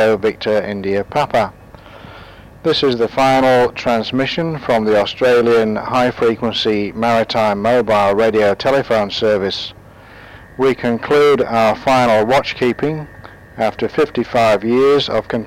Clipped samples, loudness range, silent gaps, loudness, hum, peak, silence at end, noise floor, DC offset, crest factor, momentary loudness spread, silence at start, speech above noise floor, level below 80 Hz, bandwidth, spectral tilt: under 0.1%; 2 LU; none; -15 LUFS; none; -8 dBFS; 0 s; -39 dBFS; under 0.1%; 8 dB; 7 LU; 0 s; 24 dB; -46 dBFS; 16 kHz; -5.5 dB/octave